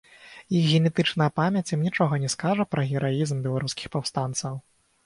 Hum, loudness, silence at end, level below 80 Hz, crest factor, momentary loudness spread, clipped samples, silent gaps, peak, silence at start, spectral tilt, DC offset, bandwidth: none; -25 LUFS; 0.45 s; -60 dBFS; 16 dB; 8 LU; under 0.1%; none; -10 dBFS; 0.2 s; -5.5 dB/octave; under 0.1%; 11.5 kHz